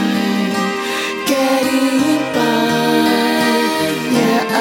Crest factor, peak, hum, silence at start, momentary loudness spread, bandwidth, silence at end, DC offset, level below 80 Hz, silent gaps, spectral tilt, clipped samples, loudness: 14 dB; -2 dBFS; none; 0 s; 4 LU; 17 kHz; 0 s; under 0.1%; -58 dBFS; none; -4 dB/octave; under 0.1%; -15 LUFS